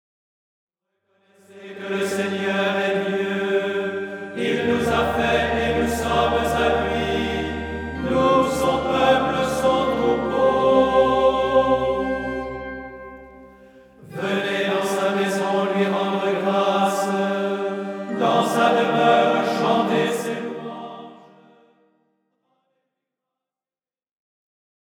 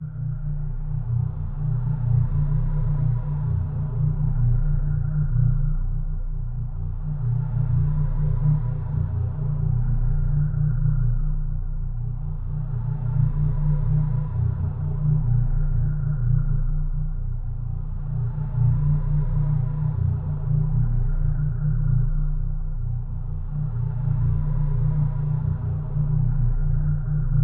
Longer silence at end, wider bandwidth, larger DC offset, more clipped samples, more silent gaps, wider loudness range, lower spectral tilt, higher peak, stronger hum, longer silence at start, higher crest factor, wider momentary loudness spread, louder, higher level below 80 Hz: first, 3.8 s vs 0 s; first, 18 kHz vs 1.9 kHz; neither; neither; neither; first, 7 LU vs 2 LU; second, -5 dB/octave vs -13 dB/octave; first, -4 dBFS vs -10 dBFS; neither; first, 1.55 s vs 0 s; first, 18 dB vs 12 dB; first, 12 LU vs 8 LU; first, -21 LUFS vs -25 LUFS; second, -44 dBFS vs -26 dBFS